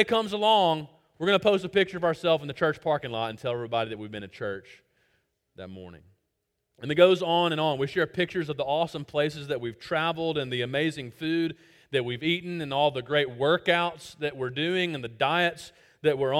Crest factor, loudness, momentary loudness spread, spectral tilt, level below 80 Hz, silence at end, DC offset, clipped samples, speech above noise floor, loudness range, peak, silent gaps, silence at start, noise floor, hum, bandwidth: 22 dB; -27 LUFS; 13 LU; -5.5 dB/octave; -64 dBFS; 0 s; under 0.1%; under 0.1%; 53 dB; 7 LU; -6 dBFS; none; 0 s; -79 dBFS; none; 15.5 kHz